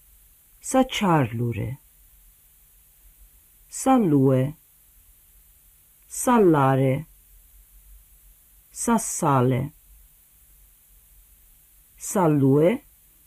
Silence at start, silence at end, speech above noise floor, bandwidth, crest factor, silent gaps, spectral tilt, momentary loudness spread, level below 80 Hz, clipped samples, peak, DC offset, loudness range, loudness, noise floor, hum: 0.65 s; 0.45 s; 35 dB; 15.5 kHz; 16 dB; none; -6 dB/octave; 17 LU; -54 dBFS; under 0.1%; -8 dBFS; under 0.1%; 4 LU; -22 LUFS; -56 dBFS; none